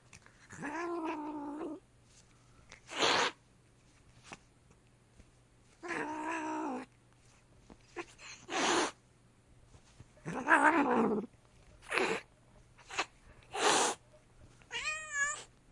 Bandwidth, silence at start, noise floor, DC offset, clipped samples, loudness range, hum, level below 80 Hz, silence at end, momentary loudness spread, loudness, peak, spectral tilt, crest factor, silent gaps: 11.5 kHz; 0.15 s; -65 dBFS; under 0.1%; under 0.1%; 10 LU; none; -68 dBFS; 0.25 s; 21 LU; -34 LUFS; -12 dBFS; -2 dB/octave; 26 dB; none